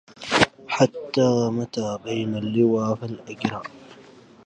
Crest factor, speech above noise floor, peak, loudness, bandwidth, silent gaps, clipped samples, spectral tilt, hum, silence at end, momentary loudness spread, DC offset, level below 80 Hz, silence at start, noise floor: 24 dB; 25 dB; 0 dBFS; -23 LUFS; 10.5 kHz; none; under 0.1%; -5.5 dB/octave; none; 0.45 s; 9 LU; under 0.1%; -56 dBFS; 0.2 s; -48 dBFS